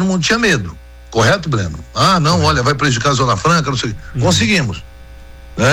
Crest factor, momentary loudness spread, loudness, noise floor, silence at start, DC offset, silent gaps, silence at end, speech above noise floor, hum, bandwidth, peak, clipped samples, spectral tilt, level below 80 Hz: 10 dB; 10 LU; -14 LUFS; -35 dBFS; 0 s; under 0.1%; none; 0 s; 21 dB; none; 16 kHz; -4 dBFS; under 0.1%; -4.5 dB/octave; -34 dBFS